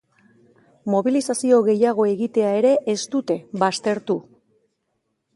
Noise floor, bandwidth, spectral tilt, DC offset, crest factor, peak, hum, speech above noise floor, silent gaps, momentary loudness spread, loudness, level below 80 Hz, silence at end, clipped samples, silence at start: -74 dBFS; 11.5 kHz; -5 dB/octave; under 0.1%; 18 dB; -4 dBFS; none; 54 dB; none; 8 LU; -20 LUFS; -72 dBFS; 1.15 s; under 0.1%; 0.85 s